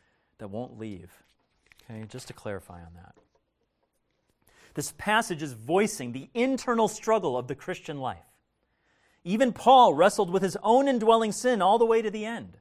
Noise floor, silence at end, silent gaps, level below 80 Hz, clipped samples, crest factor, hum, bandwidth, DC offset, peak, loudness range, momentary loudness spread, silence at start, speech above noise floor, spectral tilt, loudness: -75 dBFS; 0.1 s; none; -62 dBFS; under 0.1%; 20 dB; none; 15.5 kHz; under 0.1%; -8 dBFS; 21 LU; 20 LU; 0.4 s; 50 dB; -4.5 dB/octave; -25 LUFS